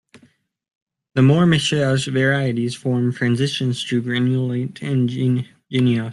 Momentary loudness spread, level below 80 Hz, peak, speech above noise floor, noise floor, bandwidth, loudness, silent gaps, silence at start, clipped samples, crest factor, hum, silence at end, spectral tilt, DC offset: 8 LU; -56 dBFS; -4 dBFS; 39 dB; -57 dBFS; 11.5 kHz; -19 LUFS; 0.75-0.87 s; 0.15 s; under 0.1%; 16 dB; none; 0 s; -6 dB/octave; under 0.1%